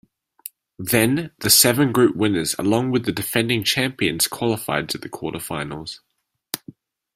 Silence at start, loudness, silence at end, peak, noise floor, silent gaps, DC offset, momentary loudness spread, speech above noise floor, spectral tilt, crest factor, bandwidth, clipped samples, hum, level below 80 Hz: 0.8 s; -19 LUFS; 0.6 s; 0 dBFS; -46 dBFS; none; under 0.1%; 18 LU; 25 dB; -3.5 dB/octave; 22 dB; 16 kHz; under 0.1%; none; -54 dBFS